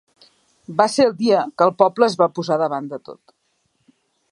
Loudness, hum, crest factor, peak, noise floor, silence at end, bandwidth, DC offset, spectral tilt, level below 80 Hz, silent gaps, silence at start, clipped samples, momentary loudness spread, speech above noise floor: -18 LUFS; none; 20 dB; 0 dBFS; -68 dBFS; 1.15 s; 11.5 kHz; under 0.1%; -5 dB/octave; -68 dBFS; none; 0.7 s; under 0.1%; 11 LU; 50 dB